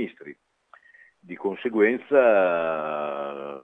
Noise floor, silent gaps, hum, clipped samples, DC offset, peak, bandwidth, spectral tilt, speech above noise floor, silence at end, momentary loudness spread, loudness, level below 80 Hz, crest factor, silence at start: -56 dBFS; none; none; under 0.1%; under 0.1%; -6 dBFS; 3.9 kHz; -7.5 dB/octave; 33 dB; 0 s; 15 LU; -23 LUFS; -78 dBFS; 20 dB; 0 s